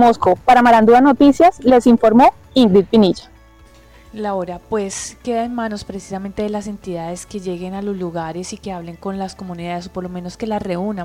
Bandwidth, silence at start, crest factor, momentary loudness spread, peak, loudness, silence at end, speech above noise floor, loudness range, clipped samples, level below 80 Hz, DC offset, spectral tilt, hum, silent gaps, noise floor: 14 kHz; 0 s; 14 dB; 17 LU; 0 dBFS; -15 LUFS; 0 s; 30 dB; 14 LU; under 0.1%; -44 dBFS; under 0.1%; -6 dB/octave; none; none; -45 dBFS